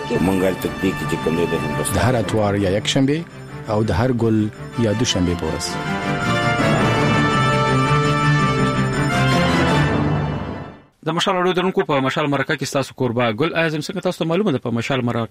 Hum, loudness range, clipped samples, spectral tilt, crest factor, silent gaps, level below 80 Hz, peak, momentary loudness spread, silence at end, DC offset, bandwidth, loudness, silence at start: none; 3 LU; under 0.1%; -5.5 dB/octave; 16 dB; none; -40 dBFS; -4 dBFS; 7 LU; 0.05 s; under 0.1%; 15.5 kHz; -19 LUFS; 0 s